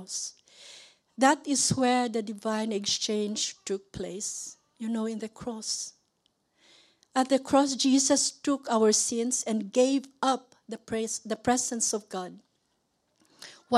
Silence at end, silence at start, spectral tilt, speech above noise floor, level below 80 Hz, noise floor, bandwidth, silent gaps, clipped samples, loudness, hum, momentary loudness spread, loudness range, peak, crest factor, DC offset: 0 s; 0 s; -2.5 dB/octave; 47 dB; -66 dBFS; -75 dBFS; 14 kHz; none; under 0.1%; -28 LUFS; none; 15 LU; 9 LU; -8 dBFS; 22 dB; under 0.1%